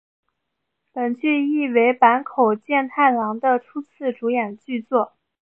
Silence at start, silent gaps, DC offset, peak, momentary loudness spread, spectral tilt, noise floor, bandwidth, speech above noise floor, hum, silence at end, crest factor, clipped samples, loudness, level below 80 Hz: 0.95 s; none; under 0.1%; 0 dBFS; 11 LU; -8 dB/octave; -78 dBFS; 3.6 kHz; 58 dB; none; 0.35 s; 20 dB; under 0.1%; -20 LUFS; -78 dBFS